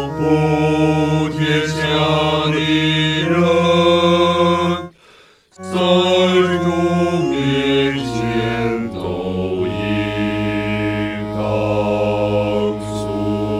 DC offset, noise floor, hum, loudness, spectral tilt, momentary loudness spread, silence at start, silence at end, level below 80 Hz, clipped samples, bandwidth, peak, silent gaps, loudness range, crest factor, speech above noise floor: under 0.1%; -48 dBFS; none; -17 LUFS; -6 dB/octave; 8 LU; 0 s; 0 s; -42 dBFS; under 0.1%; 14 kHz; -2 dBFS; none; 5 LU; 16 dB; 33 dB